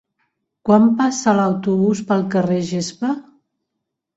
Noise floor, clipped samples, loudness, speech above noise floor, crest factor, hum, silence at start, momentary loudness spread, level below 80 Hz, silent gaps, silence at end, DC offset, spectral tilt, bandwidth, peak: -79 dBFS; under 0.1%; -18 LUFS; 62 dB; 16 dB; none; 0.65 s; 10 LU; -60 dBFS; none; 0.95 s; under 0.1%; -6 dB/octave; 8 kHz; -2 dBFS